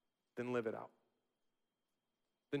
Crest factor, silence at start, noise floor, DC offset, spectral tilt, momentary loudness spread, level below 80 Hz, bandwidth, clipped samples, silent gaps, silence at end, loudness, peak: 22 dB; 0.35 s; -90 dBFS; under 0.1%; -7 dB/octave; 14 LU; under -90 dBFS; 12 kHz; under 0.1%; none; 0 s; -44 LUFS; -26 dBFS